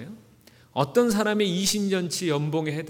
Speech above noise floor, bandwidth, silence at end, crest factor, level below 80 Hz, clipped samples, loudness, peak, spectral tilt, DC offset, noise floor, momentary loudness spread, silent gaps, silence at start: 31 dB; 19 kHz; 0 s; 18 dB; -60 dBFS; under 0.1%; -24 LUFS; -8 dBFS; -4.5 dB/octave; under 0.1%; -55 dBFS; 6 LU; none; 0 s